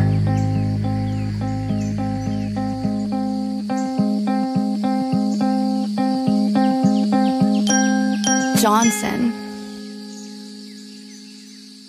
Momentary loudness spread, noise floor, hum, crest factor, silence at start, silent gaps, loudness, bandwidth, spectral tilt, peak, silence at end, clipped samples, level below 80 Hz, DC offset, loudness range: 18 LU; -40 dBFS; none; 14 dB; 0 s; none; -20 LUFS; 15.5 kHz; -5 dB/octave; -6 dBFS; 0 s; under 0.1%; -44 dBFS; under 0.1%; 6 LU